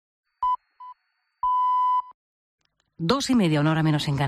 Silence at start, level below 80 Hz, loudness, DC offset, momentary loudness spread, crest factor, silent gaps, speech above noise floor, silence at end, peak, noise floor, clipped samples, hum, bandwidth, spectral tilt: 0.4 s; -56 dBFS; -23 LUFS; under 0.1%; 8 LU; 16 dB; 2.14-2.58 s; 52 dB; 0 s; -8 dBFS; -73 dBFS; under 0.1%; none; 13 kHz; -6 dB/octave